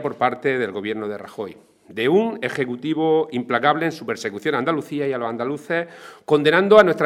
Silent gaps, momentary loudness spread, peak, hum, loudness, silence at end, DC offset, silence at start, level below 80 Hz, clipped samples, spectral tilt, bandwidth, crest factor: none; 14 LU; 0 dBFS; none; -21 LUFS; 0 s; under 0.1%; 0 s; -64 dBFS; under 0.1%; -6 dB/octave; 13.5 kHz; 20 dB